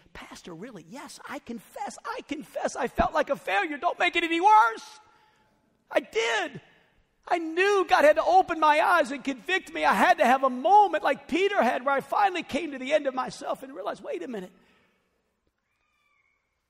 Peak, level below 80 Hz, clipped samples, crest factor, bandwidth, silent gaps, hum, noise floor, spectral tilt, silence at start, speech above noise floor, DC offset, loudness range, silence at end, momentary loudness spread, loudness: -10 dBFS; -56 dBFS; under 0.1%; 16 dB; 16 kHz; none; none; -75 dBFS; -3.5 dB/octave; 0.15 s; 50 dB; under 0.1%; 10 LU; 2.2 s; 19 LU; -24 LUFS